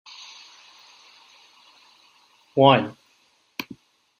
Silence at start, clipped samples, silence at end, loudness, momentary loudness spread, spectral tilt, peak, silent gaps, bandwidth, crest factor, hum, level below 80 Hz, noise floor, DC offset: 2.55 s; under 0.1%; 0.55 s; -21 LUFS; 25 LU; -6 dB/octave; -2 dBFS; none; 16 kHz; 26 dB; none; -66 dBFS; -63 dBFS; under 0.1%